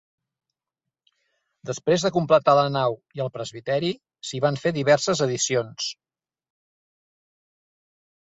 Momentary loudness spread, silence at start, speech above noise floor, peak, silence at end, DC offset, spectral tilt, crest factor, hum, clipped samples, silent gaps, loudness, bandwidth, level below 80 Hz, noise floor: 13 LU; 1.65 s; 64 dB; -6 dBFS; 2.35 s; under 0.1%; -4.5 dB/octave; 20 dB; none; under 0.1%; none; -23 LUFS; 8 kHz; -64 dBFS; -87 dBFS